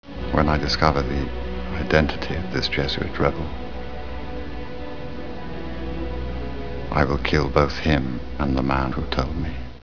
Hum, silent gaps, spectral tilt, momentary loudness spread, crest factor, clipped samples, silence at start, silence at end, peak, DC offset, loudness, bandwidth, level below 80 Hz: none; none; -6.5 dB/octave; 14 LU; 24 dB; under 0.1%; 0 s; 0 s; 0 dBFS; 2%; -24 LUFS; 5.4 kHz; -32 dBFS